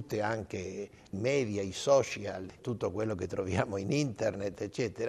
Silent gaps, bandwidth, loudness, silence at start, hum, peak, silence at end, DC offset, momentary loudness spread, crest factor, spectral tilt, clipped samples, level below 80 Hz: none; 13 kHz; -33 LUFS; 0 s; none; -12 dBFS; 0 s; under 0.1%; 12 LU; 20 dB; -5.5 dB/octave; under 0.1%; -66 dBFS